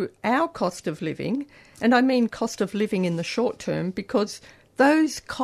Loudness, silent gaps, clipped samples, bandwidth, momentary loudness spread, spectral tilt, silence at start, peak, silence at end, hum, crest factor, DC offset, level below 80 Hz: -24 LUFS; none; under 0.1%; 13.5 kHz; 11 LU; -5.5 dB/octave; 0 s; -6 dBFS; 0 s; none; 18 dB; under 0.1%; -60 dBFS